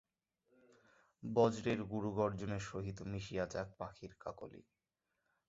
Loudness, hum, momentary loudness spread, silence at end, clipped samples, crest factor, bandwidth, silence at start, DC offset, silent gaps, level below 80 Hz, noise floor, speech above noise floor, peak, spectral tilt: -40 LUFS; none; 16 LU; 0.85 s; under 0.1%; 22 dB; 7.6 kHz; 1.2 s; under 0.1%; none; -64 dBFS; -88 dBFS; 49 dB; -20 dBFS; -6 dB/octave